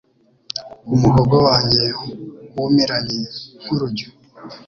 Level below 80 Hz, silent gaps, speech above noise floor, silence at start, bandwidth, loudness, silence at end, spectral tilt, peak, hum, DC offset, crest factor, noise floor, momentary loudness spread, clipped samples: -42 dBFS; none; 22 dB; 0.55 s; 7.2 kHz; -17 LUFS; 0.1 s; -6.5 dB/octave; -2 dBFS; none; under 0.1%; 18 dB; -39 dBFS; 18 LU; under 0.1%